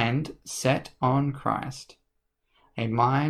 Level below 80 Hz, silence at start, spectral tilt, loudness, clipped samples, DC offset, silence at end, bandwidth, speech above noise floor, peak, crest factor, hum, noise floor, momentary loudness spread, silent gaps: -56 dBFS; 0 s; -6 dB/octave; -27 LUFS; under 0.1%; under 0.1%; 0 s; 14.5 kHz; 49 dB; -10 dBFS; 18 dB; none; -75 dBFS; 13 LU; none